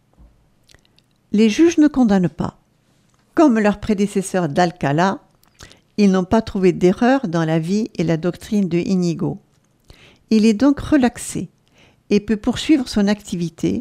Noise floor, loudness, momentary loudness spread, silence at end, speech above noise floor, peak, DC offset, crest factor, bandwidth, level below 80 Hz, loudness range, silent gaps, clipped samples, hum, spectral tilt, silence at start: -59 dBFS; -18 LUFS; 11 LU; 0 s; 42 dB; -2 dBFS; under 0.1%; 16 dB; 13.5 kHz; -46 dBFS; 2 LU; none; under 0.1%; none; -6.5 dB/octave; 1.3 s